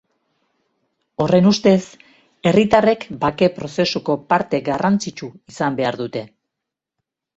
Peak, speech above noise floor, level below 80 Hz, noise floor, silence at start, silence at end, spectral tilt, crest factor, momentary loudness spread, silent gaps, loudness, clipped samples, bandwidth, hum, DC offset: -2 dBFS; 65 dB; -54 dBFS; -83 dBFS; 1.2 s; 1.1 s; -6 dB/octave; 18 dB; 15 LU; none; -18 LUFS; under 0.1%; 8 kHz; none; under 0.1%